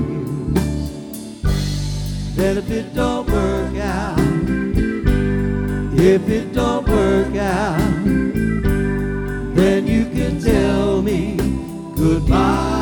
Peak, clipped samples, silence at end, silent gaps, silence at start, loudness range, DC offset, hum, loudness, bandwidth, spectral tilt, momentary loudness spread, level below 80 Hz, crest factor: 0 dBFS; under 0.1%; 0 s; none; 0 s; 4 LU; under 0.1%; none; -19 LUFS; 19 kHz; -7 dB/octave; 8 LU; -26 dBFS; 16 dB